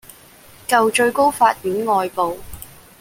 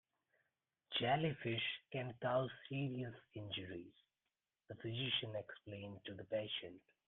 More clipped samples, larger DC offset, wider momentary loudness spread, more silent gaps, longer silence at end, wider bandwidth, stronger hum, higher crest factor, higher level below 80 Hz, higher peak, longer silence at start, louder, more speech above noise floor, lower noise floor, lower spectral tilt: neither; neither; first, 21 LU vs 14 LU; neither; about the same, 0.35 s vs 0.3 s; first, 17 kHz vs 4.3 kHz; neither; about the same, 18 dB vs 20 dB; first, -50 dBFS vs -78 dBFS; first, -2 dBFS vs -26 dBFS; second, 0.7 s vs 0.9 s; first, -17 LUFS vs -43 LUFS; second, 28 dB vs over 47 dB; second, -45 dBFS vs under -90 dBFS; about the same, -3.5 dB/octave vs -3.5 dB/octave